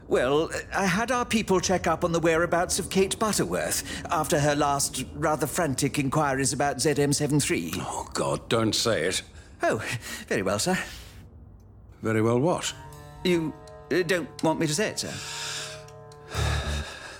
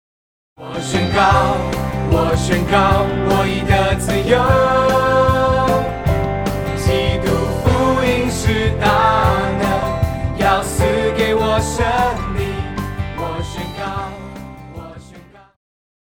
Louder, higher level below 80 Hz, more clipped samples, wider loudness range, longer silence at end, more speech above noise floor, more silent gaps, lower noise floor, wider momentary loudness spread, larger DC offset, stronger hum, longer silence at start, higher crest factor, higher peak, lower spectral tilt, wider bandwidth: second, -26 LUFS vs -16 LUFS; second, -46 dBFS vs -28 dBFS; neither; second, 4 LU vs 7 LU; second, 0 s vs 0.85 s; second, 23 dB vs 27 dB; neither; first, -49 dBFS vs -41 dBFS; about the same, 9 LU vs 11 LU; neither; neither; second, 0 s vs 0.6 s; about the same, 16 dB vs 16 dB; second, -10 dBFS vs 0 dBFS; second, -4 dB/octave vs -5.5 dB/octave; about the same, 18 kHz vs 19.5 kHz